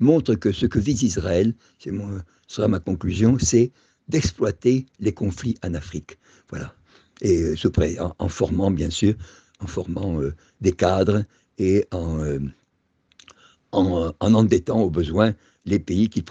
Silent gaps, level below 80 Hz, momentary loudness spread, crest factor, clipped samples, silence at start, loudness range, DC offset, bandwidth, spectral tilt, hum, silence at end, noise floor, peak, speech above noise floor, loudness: none; -44 dBFS; 14 LU; 20 dB; under 0.1%; 0 s; 4 LU; under 0.1%; 8.4 kHz; -6.5 dB/octave; none; 0 s; -68 dBFS; -2 dBFS; 47 dB; -22 LUFS